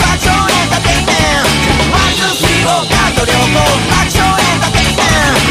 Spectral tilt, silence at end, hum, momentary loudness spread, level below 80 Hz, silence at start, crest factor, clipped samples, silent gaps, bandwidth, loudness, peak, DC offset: -3.5 dB/octave; 0 s; none; 1 LU; -22 dBFS; 0 s; 10 dB; under 0.1%; none; 16 kHz; -10 LUFS; 0 dBFS; under 0.1%